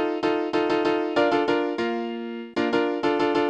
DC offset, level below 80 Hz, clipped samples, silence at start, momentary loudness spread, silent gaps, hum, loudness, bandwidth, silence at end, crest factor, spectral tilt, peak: under 0.1%; -62 dBFS; under 0.1%; 0 s; 8 LU; none; none; -24 LUFS; 8.8 kHz; 0 s; 16 dB; -5.5 dB/octave; -8 dBFS